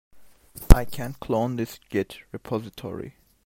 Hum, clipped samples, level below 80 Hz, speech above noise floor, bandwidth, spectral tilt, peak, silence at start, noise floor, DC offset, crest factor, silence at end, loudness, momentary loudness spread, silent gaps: none; under 0.1%; -26 dBFS; 17 dB; 16.5 kHz; -6.5 dB/octave; 0 dBFS; 0.55 s; -47 dBFS; under 0.1%; 24 dB; 0.35 s; -26 LUFS; 20 LU; none